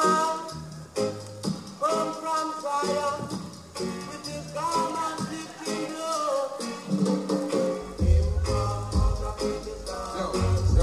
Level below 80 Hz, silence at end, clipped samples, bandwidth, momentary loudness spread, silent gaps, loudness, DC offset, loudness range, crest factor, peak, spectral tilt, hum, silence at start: -34 dBFS; 0 s; under 0.1%; 13 kHz; 10 LU; none; -28 LUFS; under 0.1%; 3 LU; 18 dB; -8 dBFS; -5.5 dB/octave; none; 0 s